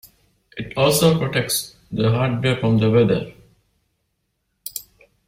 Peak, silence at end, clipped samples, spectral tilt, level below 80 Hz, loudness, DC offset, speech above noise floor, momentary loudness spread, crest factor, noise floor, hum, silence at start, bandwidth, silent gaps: -4 dBFS; 0.45 s; under 0.1%; -5 dB/octave; -48 dBFS; -19 LUFS; under 0.1%; 54 dB; 18 LU; 18 dB; -72 dBFS; none; 0.55 s; 16 kHz; none